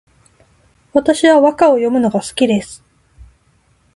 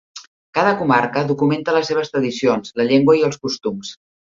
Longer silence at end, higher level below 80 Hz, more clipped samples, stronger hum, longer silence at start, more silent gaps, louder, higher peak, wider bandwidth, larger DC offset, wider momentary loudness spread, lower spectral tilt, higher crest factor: first, 0.7 s vs 0.35 s; first, -50 dBFS vs -60 dBFS; neither; neither; first, 0.95 s vs 0.15 s; second, none vs 0.27-0.53 s; first, -13 LUFS vs -18 LUFS; about the same, 0 dBFS vs -2 dBFS; first, 11.5 kHz vs 7.6 kHz; neither; about the same, 8 LU vs 10 LU; about the same, -5 dB/octave vs -5.5 dB/octave; about the same, 16 dB vs 16 dB